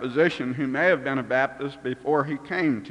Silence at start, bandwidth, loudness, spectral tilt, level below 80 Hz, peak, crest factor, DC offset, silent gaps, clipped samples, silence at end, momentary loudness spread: 0 s; 10.5 kHz; -25 LUFS; -7 dB/octave; -64 dBFS; -8 dBFS; 16 dB; under 0.1%; none; under 0.1%; 0 s; 8 LU